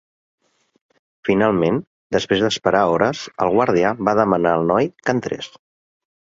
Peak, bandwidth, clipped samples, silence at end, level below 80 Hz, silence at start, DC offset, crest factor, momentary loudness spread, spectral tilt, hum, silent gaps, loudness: -2 dBFS; 7.8 kHz; under 0.1%; 0.75 s; -52 dBFS; 1.25 s; under 0.1%; 18 dB; 8 LU; -5.5 dB/octave; none; 1.87-2.10 s; -19 LUFS